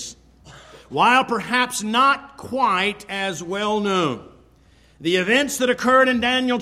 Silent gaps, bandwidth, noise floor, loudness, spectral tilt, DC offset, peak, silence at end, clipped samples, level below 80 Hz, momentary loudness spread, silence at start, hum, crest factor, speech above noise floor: none; 15.5 kHz; -53 dBFS; -19 LUFS; -3.5 dB/octave; under 0.1%; -4 dBFS; 0 s; under 0.1%; -56 dBFS; 10 LU; 0 s; none; 18 dB; 34 dB